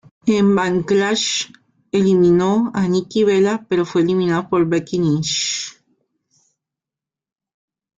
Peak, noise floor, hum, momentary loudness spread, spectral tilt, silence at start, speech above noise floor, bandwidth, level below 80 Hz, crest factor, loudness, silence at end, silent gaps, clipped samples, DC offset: -6 dBFS; -88 dBFS; none; 7 LU; -5 dB/octave; 0.25 s; 71 dB; 9.4 kHz; -56 dBFS; 14 dB; -17 LUFS; 2.3 s; none; under 0.1%; under 0.1%